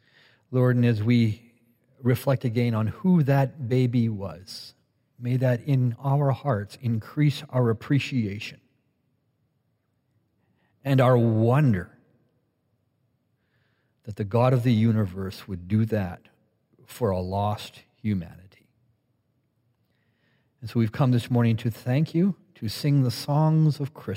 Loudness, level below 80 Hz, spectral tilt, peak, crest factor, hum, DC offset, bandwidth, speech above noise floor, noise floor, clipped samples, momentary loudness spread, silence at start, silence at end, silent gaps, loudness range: -24 LUFS; -66 dBFS; -8 dB/octave; -8 dBFS; 16 dB; none; under 0.1%; 16 kHz; 49 dB; -72 dBFS; under 0.1%; 15 LU; 0.5 s; 0 s; none; 8 LU